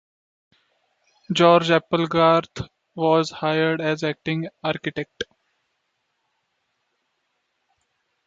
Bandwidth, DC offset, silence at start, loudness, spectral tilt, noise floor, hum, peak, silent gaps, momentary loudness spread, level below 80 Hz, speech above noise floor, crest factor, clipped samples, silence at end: 7.8 kHz; under 0.1%; 1.3 s; -21 LUFS; -6 dB/octave; -74 dBFS; none; -2 dBFS; none; 18 LU; -60 dBFS; 53 dB; 22 dB; under 0.1%; 3.05 s